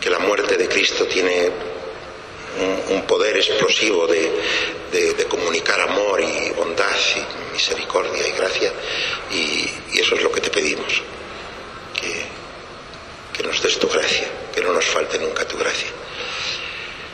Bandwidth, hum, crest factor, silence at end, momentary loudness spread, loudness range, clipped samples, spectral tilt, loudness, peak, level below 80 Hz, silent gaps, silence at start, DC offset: 13 kHz; none; 18 dB; 0 s; 15 LU; 4 LU; under 0.1%; -1.5 dB/octave; -19 LUFS; -2 dBFS; -50 dBFS; none; 0 s; under 0.1%